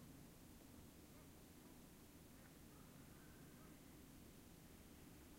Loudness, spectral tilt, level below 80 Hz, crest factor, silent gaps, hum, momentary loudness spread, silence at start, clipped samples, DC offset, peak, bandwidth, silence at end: -63 LUFS; -4.5 dB/octave; -72 dBFS; 14 dB; none; none; 1 LU; 0 s; under 0.1%; under 0.1%; -50 dBFS; 16 kHz; 0 s